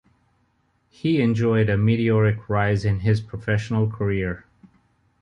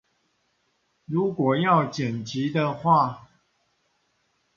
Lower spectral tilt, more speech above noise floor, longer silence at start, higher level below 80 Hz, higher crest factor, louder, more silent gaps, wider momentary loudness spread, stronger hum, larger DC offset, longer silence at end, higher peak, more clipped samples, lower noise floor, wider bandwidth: first, -8.5 dB/octave vs -7 dB/octave; about the same, 46 dB vs 48 dB; about the same, 1.05 s vs 1.1 s; first, -44 dBFS vs -66 dBFS; second, 14 dB vs 20 dB; about the same, -22 LUFS vs -24 LUFS; neither; about the same, 6 LU vs 8 LU; neither; neither; second, 0.8 s vs 1.4 s; about the same, -8 dBFS vs -6 dBFS; neither; second, -66 dBFS vs -71 dBFS; about the same, 7.4 kHz vs 7.4 kHz